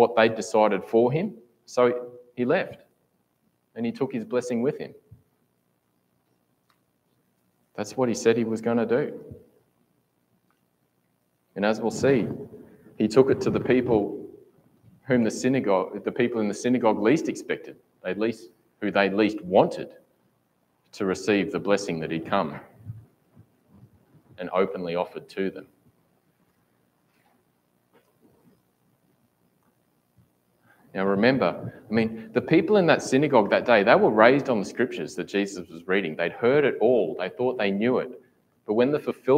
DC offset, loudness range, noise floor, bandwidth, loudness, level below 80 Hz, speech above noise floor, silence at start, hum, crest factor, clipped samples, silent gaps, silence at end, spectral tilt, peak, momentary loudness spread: under 0.1%; 11 LU; -71 dBFS; 15 kHz; -24 LUFS; -66 dBFS; 47 dB; 0 s; 60 Hz at -60 dBFS; 24 dB; under 0.1%; none; 0 s; -6 dB/octave; -2 dBFS; 17 LU